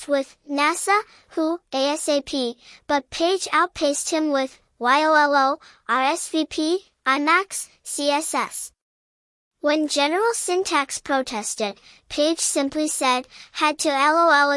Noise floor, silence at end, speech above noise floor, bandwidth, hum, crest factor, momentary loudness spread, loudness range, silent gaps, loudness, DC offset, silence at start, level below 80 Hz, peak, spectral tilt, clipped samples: under -90 dBFS; 0 s; over 68 dB; 12 kHz; none; 18 dB; 11 LU; 3 LU; 8.82-9.51 s; -22 LUFS; under 0.1%; 0 s; -62 dBFS; -4 dBFS; -1 dB/octave; under 0.1%